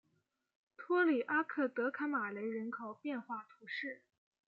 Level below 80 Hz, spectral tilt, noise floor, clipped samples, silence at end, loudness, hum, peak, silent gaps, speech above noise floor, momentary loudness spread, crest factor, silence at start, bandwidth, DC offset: under -90 dBFS; -3 dB/octave; -81 dBFS; under 0.1%; 0.5 s; -38 LUFS; none; -22 dBFS; none; 44 dB; 14 LU; 18 dB; 0.8 s; 5.6 kHz; under 0.1%